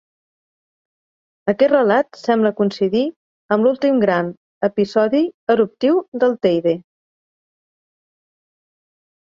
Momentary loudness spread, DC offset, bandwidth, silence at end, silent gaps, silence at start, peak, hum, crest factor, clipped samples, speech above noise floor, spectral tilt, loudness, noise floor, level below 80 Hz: 7 LU; under 0.1%; 7.4 kHz; 2.45 s; 3.16-3.49 s, 4.37-4.61 s, 5.34-5.47 s, 6.08-6.12 s; 1.45 s; -2 dBFS; none; 18 dB; under 0.1%; over 73 dB; -7.5 dB/octave; -18 LUFS; under -90 dBFS; -64 dBFS